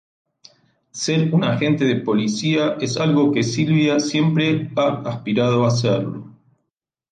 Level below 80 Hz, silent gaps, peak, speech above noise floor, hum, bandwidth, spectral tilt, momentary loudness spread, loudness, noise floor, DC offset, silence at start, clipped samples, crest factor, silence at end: -60 dBFS; none; -6 dBFS; 61 dB; none; 9.4 kHz; -6 dB/octave; 6 LU; -19 LUFS; -79 dBFS; under 0.1%; 0.95 s; under 0.1%; 14 dB; 0.8 s